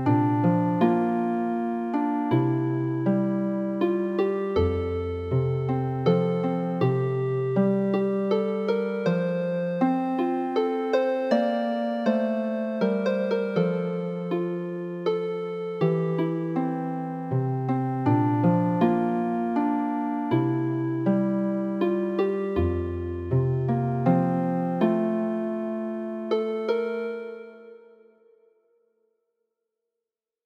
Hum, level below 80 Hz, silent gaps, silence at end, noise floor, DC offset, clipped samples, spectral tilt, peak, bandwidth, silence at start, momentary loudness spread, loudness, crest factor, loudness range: none; -52 dBFS; none; 2.7 s; -87 dBFS; under 0.1%; under 0.1%; -9.5 dB/octave; -8 dBFS; 6.6 kHz; 0 s; 7 LU; -25 LUFS; 16 dB; 3 LU